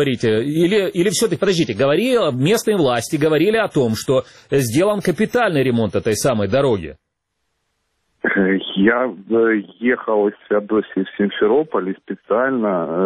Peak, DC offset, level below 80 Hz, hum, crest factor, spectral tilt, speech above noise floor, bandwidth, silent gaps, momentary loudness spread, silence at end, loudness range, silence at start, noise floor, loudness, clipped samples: -2 dBFS; under 0.1%; -52 dBFS; none; 16 dB; -5.5 dB/octave; 56 dB; 14 kHz; none; 5 LU; 0 s; 3 LU; 0 s; -73 dBFS; -18 LUFS; under 0.1%